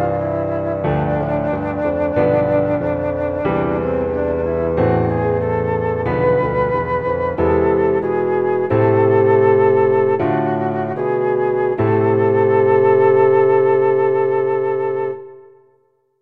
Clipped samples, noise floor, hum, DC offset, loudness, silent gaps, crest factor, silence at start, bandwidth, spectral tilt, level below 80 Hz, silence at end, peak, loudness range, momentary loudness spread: under 0.1%; -60 dBFS; none; under 0.1%; -17 LUFS; none; 14 dB; 0 s; 4.4 kHz; -10.5 dB/octave; -40 dBFS; 0.8 s; -4 dBFS; 4 LU; 7 LU